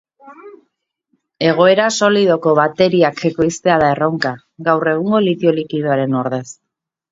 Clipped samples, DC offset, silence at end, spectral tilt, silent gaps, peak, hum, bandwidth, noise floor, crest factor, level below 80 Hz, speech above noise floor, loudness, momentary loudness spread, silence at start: under 0.1%; under 0.1%; 0.6 s; -5.5 dB/octave; none; 0 dBFS; none; 8 kHz; -69 dBFS; 16 dB; -54 dBFS; 54 dB; -15 LUFS; 8 LU; 0.25 s